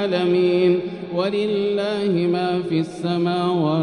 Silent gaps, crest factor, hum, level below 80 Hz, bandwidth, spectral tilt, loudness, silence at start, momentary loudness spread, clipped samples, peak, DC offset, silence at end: none; 12 dB; none; -62 dBFS; 10 kHz; -7.5 dB/octave; -21 LUFS; 0 s; 6 LU; under 0.1%; -8 dBFS; under 0.1%; 0 s